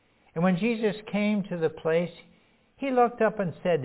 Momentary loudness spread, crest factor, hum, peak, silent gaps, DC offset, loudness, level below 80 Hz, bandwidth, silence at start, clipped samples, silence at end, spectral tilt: 6 LU; 18 dB; none; -10 dBFS; none; under 0.1%; -27 LUFS; -66 dBFS; 4 kHz; 0.35 s; under 0.1%; 0 s; -11 dB/octave